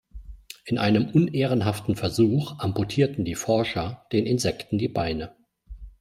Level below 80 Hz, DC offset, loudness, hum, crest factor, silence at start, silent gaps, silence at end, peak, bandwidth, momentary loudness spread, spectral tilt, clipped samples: -48 dBFS; under 0.1%; -25 LUFS; none; 18 dB; 0.15 s; none; 0.1 s; -6 dBFS; 16 kHz; 8 LU; -6 dB/octave; under 0.1%